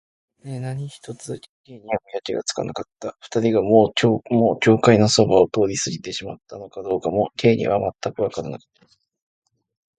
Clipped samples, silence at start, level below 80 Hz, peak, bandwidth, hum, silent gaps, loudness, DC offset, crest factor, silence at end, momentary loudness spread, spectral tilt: under 0.1%; 0.45 s; -54 dBFS; 0 dBFS; 11.5 kHz; none; 1.49-1.64 s; -20 LUFS; under 0.1%; 22 dB; 1.4 s; 19 LU; -5 dB/octave